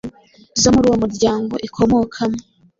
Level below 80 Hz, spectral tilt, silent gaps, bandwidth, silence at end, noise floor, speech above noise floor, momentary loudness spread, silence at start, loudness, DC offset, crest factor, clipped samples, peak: -40 dBFS; -4.5 dB/octave; none; 7.8 kHz; 0.4 s; -39 dBFS; 23 dB; 11 LU; 0.05 s; -17 LUFS; under 0.1%; 16 dB; under 0.1%; -2 dBFS